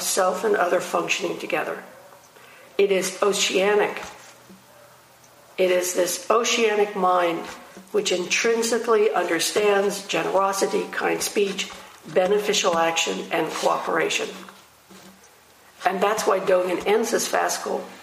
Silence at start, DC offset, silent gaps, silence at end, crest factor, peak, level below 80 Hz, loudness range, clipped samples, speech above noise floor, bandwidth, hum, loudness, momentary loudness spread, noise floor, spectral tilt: 0 s; under 0.1%; none; 0 s; 20 dB; -4 dBFS; -68 dBFS; 3 LU; under 0.1%; 30 dB; 15.5 kHz; none; -22 LUFS; 8 LU; -52 dBFS; -2.5 dB/octave